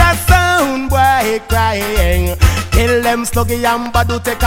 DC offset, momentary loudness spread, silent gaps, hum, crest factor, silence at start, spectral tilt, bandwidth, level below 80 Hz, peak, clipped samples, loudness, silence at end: under 0.1%; 5 LU; none; none; 12 dB; 0 s; -4.5 dB/octave; 17.5 kHz; -20 dBFS; 0 dBFS; 0.2%; -13 LUFS; 0 s